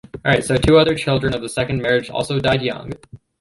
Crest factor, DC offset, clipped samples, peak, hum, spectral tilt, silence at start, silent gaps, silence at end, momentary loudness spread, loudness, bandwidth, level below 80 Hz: 16 dB; under 0.1%; under 0.1%; -2 dBFS; none; -5.5 dB/octave; 0.15 s; none; 0.25 s; 12 LU; -18 LUFS; 11.5 kHz; -38 dBFS